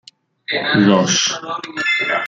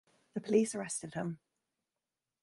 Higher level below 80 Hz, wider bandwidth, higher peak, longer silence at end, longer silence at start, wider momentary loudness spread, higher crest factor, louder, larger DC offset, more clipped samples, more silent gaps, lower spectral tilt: first, -58 dBFS vs -76 dBFS; second, 7.8 kHz vs 11.5 kHz; first, -2 dBFS vs -16 dBFS; second, 0 s vs 1.05 s; first, 0.5 s vs 0.35 s; about the same, 12 LU vs 14 LU; about the same, 16 dB vs 20 dB; first, -16 LUFS vs -35 LUFS; neither; neither; neither; second, -3.5 dB/octave vs -5 dB/octave